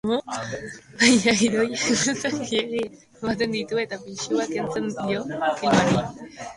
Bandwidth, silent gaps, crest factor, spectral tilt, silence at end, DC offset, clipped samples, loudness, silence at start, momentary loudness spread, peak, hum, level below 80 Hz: 11.5 kHz; none; 20 dB; -3.5 dB/octave; 0 s; under 0.1%; under 0.1%; -23 LUFS; 0.05 s; 14 LU; -2 dBFS; none; -56 dBFS